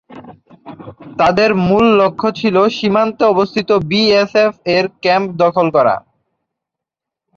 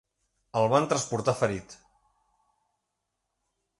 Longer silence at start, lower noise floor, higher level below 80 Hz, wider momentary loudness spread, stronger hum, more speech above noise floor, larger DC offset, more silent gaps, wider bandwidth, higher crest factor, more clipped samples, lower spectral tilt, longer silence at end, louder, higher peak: second, 0.1 s vs 0.55 s; about the same, -83 dBFS vs -82 dBFS; first, -48 dBFS vs -62 dBFS; second, 5 LU vs 8 LU; neither; first, 71 dB vs 56 dB; neither; neither; second, 7.4 kHz vs 11.5 kHz; second, 14 dB vs 22 dB; neither; about the same, -6 dB/octave vs -5 dB/octave; second, 1.4 s vs 2.05 s; first, -13 LUFS vs -27 LUFS; first, 0 dBFS vs -8 dBFS